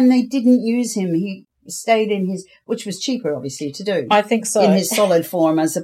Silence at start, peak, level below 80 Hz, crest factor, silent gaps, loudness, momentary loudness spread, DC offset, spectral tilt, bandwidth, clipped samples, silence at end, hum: 0 s; -2 dBFS; -70 dBFS; 16 dB; none; -18 LUFS; 12 LU; under 0.1%; -5 dB/octave; 15.5 kHz; under 0.1%; 0 s; none